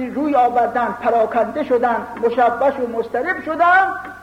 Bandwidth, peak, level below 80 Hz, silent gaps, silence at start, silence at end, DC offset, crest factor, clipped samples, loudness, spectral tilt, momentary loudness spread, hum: 10 kHz; -4 dBFS; -54 dBFS; none; 0 s; 0 s; under 0.1%; 14 dB; under 0.1%; -17 LUFS; -6 dB/octave; 8 LU; none